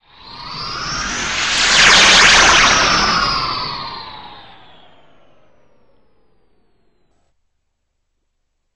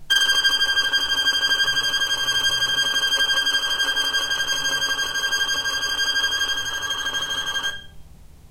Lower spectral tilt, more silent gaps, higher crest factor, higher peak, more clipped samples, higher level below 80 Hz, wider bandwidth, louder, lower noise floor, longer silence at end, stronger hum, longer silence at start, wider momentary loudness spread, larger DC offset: first, -0.5 dB/octave vs 1.5 dB/octave; neither; about the same, 18 dB vs 18 dB; first, 0 dBFS vs -4 dBFS; neither; first, -38 dBFS vs -48 dBFS; second, 13.5 kHz vs 16 kHz; first, -11 LUFS vs -19 LUFS; first, -70 dBFS vs -43 dBFS; first, 4.35 s vs 0.05 s; neither; first, 0.25 s vs 0 s; first, 22 LU vs 6 LU; first, 0.4% vs under 0.1%